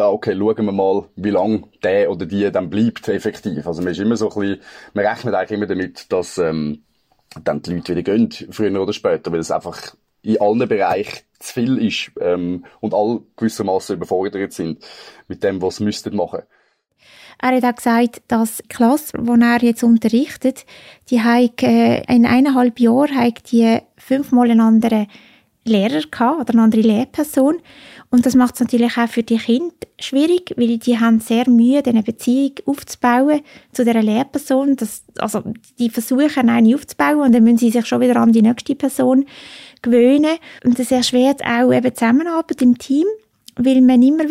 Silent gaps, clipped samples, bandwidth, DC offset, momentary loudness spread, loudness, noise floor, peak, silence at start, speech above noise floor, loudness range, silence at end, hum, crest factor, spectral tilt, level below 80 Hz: none; under 0.1%; 15.5 kHz; under 0.1%; 11 LU; -16 LUFS; -59 dBFS; -4 dBFS; 0 s; 43 dB; 7 LU; 0 s; none; 12 dB; -5.5 dB/octave; -56 dBFS